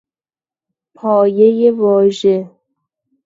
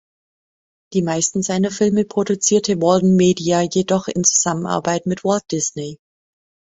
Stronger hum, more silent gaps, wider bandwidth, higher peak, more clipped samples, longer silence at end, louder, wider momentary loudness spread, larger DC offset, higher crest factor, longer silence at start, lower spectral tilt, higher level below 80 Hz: neither; neither; about the same, 7.8 kHz vs 8 kHz; about the same, 0 dBFS vs -2 dBFS; neither; about the same, 0.8 s vs 0.8 s; first, -13 LUFS vs -18 LUFS; about the same, 7 LU vs 7 LU; neither; about the same, 14 dB vs 18 dB; first, 1.05 s vs 0.9 s; first, -7.5 dB/octave vs -4.5 dB/octave; second, -64 dBFS vs -56 dBFS